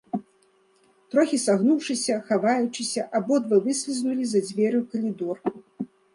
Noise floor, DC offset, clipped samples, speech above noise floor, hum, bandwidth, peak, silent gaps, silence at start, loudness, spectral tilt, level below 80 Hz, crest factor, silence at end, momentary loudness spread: -62 dBFS; under 0.1%; under 0.1%; 39 dB; none; 11.5 kHz; -8 dBFS; none; 0.15 s; -24 LUFS; -4.5 dB/octave; -74 dBFS; 16 dB; 0.3 s; 11 LU